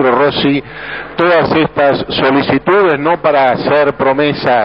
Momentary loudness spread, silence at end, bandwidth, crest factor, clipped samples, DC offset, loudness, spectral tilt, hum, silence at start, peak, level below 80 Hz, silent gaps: 4 LU; 0 s; 5.8 kHz; 12 dB; under 0.1%; 0.3%; -12 LUFS; -8.5 dB/octave; none; 0 s; 0 dBFS; -42 dBFS; none